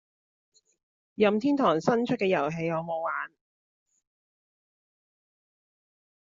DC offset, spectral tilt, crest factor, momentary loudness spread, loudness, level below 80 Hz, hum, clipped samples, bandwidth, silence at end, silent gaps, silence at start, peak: under 0.1%; -5 dB/octave; 22 dB; 10 LU; -27 LUFS; -70 dBFS; none; under 0.1%; 7.4 kHz; 3 s; none; 1.2 s; -10 dBFS